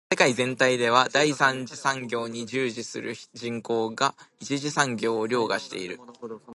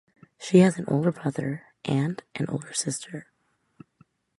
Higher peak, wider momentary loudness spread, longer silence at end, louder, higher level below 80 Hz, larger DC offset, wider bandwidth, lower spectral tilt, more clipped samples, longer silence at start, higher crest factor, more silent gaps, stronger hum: about the same, -4 dBFS vs -6 dBFS; about the same, 14 LU vs 16 LU; second, 0 s vs 1.15 s; about the same, -25 LUFS vs -26 LUFS; second, -72 dBFS vs -66 dBFS; neither; about the same, 11.5 kHz vs 11.5 kHz; second, -3.5 dB/octave vs -6 dB/octave; neither; second, 0.1 s vs 0.4 s; about the same, 24 dB vs 22 dB; neither; neither